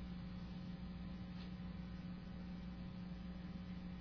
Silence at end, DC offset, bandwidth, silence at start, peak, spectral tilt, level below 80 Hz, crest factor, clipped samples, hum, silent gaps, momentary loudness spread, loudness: 0 s; under 0.1%; 5.4 kHz; 0 s; -38 dBFS; -7 dB/octave; -56 dBFS; 10 dB; under 0.1%; none; none; 1 LU; -50 LUFS